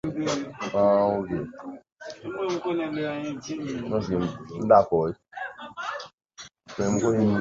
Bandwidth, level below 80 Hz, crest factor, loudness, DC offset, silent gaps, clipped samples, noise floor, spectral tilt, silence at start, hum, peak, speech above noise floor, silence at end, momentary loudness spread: 8 kHz; -56 dBFS; 22 dB; -26 LUFS; under 0.1%; 1.92-1.96 s, 6.14-6.18 s; under 0.1%; -46 dBFS; -6 dB/octave; 0.05 s; none; -4 dBFS; 21 dB; 0 s; 21 LU